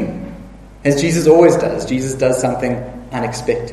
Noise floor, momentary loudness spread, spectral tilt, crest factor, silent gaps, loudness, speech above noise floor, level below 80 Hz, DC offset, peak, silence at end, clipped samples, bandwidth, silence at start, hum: -36 dBFS; 16 LU; -5.5 dB/octave; 16 dB; none; -15 LUFS; 21 dB; -40 dBFS; under 0.1%; 0 dBFS; 0 s; under 0.1%; 13.5 kHz; 0 s; none